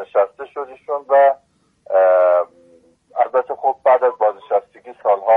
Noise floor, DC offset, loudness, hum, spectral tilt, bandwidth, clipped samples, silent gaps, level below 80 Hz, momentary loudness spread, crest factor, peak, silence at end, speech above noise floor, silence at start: -52 dBFS; under 0.1%; -17 LUFS; none; -5.5 dB/octave; 3.8 kHz; under 0.1%; none; -70 dBFS; 16 LU; 14 dB; -4 dBFS; 0 s; 35 dB; 0 s